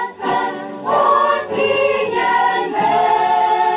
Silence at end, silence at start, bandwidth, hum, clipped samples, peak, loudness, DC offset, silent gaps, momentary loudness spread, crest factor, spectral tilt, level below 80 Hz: 0 s; 0 s; 4 kHz; none; under 0.1%; -4 dBFS; -16 LUFS; under 0.1%; none; 6 LU; 12 dB; -7.5 dB/octave; -58 dBFS